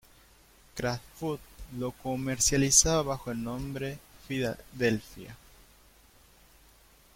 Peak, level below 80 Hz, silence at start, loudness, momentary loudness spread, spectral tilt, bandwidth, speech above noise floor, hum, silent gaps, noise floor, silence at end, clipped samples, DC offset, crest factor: -8 dBFS; -48 dBFS; 0.75 s; -29 LUFS; 23 LU; -3 dB/octave; 16.5 kHz; 29 dB; none; none; -59 dBFS; 1.8 s; under 0.1%; under 0.1%; 24 dB